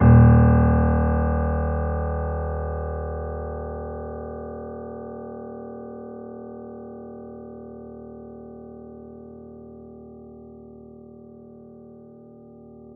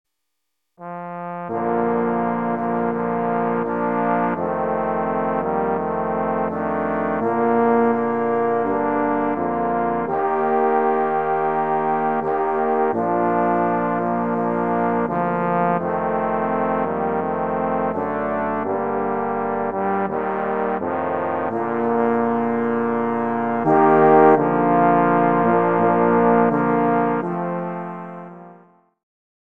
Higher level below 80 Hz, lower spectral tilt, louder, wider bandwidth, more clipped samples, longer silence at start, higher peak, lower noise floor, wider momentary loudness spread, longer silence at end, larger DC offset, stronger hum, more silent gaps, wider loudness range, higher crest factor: first, -30 dBFS vs -60 dBFS; first, -12.5 dB/octave vs -10 dB/octave; about the same, -22 LUFS vs -20 LUFS; second, 2.9 kHz vs 3.9 kHz; neither; second, 0 s vs 0.8 s; about the same, -4 dBFS vs -2 dBFS; second, -45 dBFS vs -79 dBFS; first, 26 LU vs 7 LU; second, 0 s vs 0.95 s; second, under 0.1% vs 0.5%; neither; neither; first, 20 LU vs 6 LU; about the same, 20 dB vs 18 dB